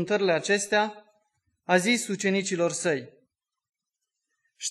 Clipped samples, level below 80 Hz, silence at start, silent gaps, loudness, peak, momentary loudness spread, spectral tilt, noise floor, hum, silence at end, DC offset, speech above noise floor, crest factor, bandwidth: under 0.1%; -78 dBFS; 0 s; none; -26 LUFS; -8 dBFS; 9 LU; -3.5 dB/octave; -85 dBFS; none; 0 s; under 0.1%; 60 dB; 20 dB; 12.5 kHz